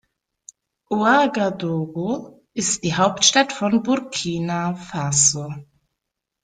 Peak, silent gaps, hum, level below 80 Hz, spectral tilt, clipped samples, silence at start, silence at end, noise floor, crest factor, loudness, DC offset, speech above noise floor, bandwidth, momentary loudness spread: 0 dBFS; none; none; -60 dBFS; -3 dB/octave; under 0.1%; 0.9 s; 0.8 s; -81 dBFS; 22 dB; -20 LUFS; under 0.1%; 61 dB; 10.5 kHz; 12 LU